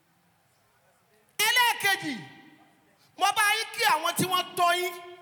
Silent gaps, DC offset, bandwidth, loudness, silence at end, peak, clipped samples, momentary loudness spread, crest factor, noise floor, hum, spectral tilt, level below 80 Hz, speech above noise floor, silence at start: none; under 0.1%; 19.5 kHz; -25 LUFS; 0.05 s; -10 dBFS; under 0.1%; 12 LU; 18 dB; -66 dBFS; none; -1.5 dB/octave; -84 dBFS; 38 dB; 1.4 s